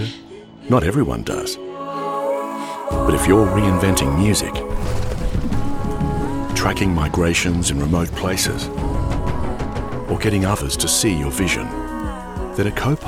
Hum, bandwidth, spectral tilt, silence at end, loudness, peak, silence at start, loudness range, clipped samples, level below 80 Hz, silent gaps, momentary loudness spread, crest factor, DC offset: none; 17 kHz; -5 dB/octave; 0 s; -20 LUFS; -2 dBFS; 0 s; 3 LU; under 0.1%; -28 dBFS; none; 10 LU; 18 dB; under 0.1%